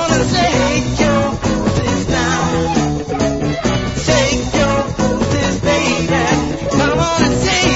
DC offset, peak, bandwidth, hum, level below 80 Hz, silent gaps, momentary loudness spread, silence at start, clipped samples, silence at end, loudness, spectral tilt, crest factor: under 0.1%; 0 dBFS; 8 kHz; none; -28 dBFS; none; 4 LU; 0 s; under 0.1%; 0 s; -15 LUFS; -4.5 dB/octave; 14 dB